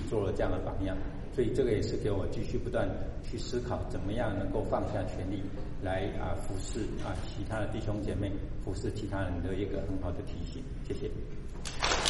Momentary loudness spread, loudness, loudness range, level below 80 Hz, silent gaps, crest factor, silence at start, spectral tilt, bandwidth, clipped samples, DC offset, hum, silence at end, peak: 8 LU; -35 LUFS; 3 LU; -40 dBFS; none; 24 dB; 0 s; -5.5 dB/octave; 11.5 kHz; under 0.1%; under 0.1%; none; 0 s; -8 dBFS